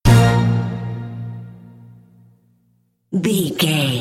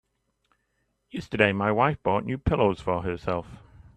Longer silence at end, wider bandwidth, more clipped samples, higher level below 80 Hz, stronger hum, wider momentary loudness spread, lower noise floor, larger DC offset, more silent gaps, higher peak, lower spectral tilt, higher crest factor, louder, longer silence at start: second, 0 s vs 0.4 s; first, 15.5 kHz vs 9.6 kHz; neither; first, -34 dBFS vs -46 dBFS; neither; first, 19 LU vs 11 LU; second, -62 dBFS vs -74 dBFS; neither; neither; about the same, -2 dBFS vs -4 dBFS; second, -5.5 dB/octave vs -7.5 dB/octave; second, 18 dB vs 24 dB; first, -18 LUFS vs -25 LUFS; second, 0.05 s vs 1.15 s